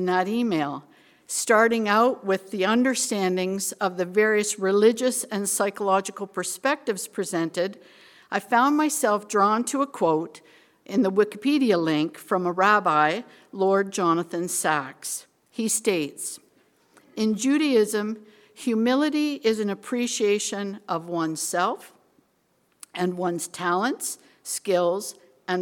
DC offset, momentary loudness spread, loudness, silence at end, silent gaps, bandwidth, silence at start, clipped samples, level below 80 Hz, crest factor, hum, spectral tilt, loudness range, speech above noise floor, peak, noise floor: under 0.1%; 12 LU; -24 LUFS; 0 s; none; 18 kHz; 0 s; under 0.1%; -74 dBFS; 20 dB; none; -3.5 dB/octave; 5 LU; 44 dB; -6 dBFS; -67 dBFS